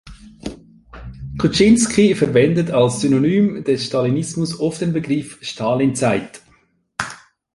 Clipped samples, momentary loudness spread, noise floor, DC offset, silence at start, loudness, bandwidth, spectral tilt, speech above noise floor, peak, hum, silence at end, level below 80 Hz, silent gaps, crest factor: under 0.1%; 20 LU; -58 dBFS; under 0.1%; 0.05 s; -17 LUFS; 11.5 kHz; -5.5 dB/octave; 41 dB; -2 dBFS; none; 0.4 s; -44 dBFS; none; 16 dB